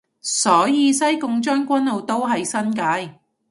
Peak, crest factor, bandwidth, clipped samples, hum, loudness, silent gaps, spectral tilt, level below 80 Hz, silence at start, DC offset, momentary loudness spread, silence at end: -2 dBFS; 18 dB; 11.5 kHz; under 0.1%; none; -19 LUFS; none; -3 dB/octave; -70 dBFS; 0.25 s; under 0.1%; 7 LU; 0.4 s